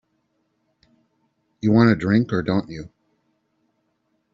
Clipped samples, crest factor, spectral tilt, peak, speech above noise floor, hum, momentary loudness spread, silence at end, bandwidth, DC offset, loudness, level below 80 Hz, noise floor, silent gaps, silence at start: under 0.1%; 20 dB; -7 dB/octave; -4 dBFS; 52 dB; none; 21 LU; 1.45 s; 7.4 kHz; under 0.1%; -19 LUFS; -56 dBFS; -71 dBFS; none; 1.65 s